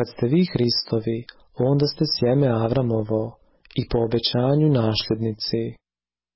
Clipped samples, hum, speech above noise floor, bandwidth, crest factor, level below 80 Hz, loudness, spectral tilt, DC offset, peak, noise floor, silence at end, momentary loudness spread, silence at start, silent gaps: under 0.1%; none; over 69 dB; 5.8 kHz; 12 dB; -46 dBFS; -22 LUFS; -10 dB/octave; under 0.1%; -10 dBFS; under -90 dBFS; 0.6 s; 10 LU; 0 s; none